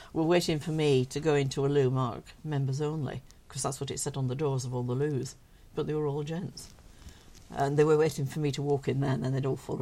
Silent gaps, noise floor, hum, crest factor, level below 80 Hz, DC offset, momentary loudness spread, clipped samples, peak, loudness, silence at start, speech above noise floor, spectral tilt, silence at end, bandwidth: none; -51 dBFS; none; 18 dB; -56 dBFS; under 0.1%; 12 LU; under 0.1%; -12 dBFS; -30 LUFS; 0 s; 22 dB; -6 dB/octave; 0 s; 14.5 kHz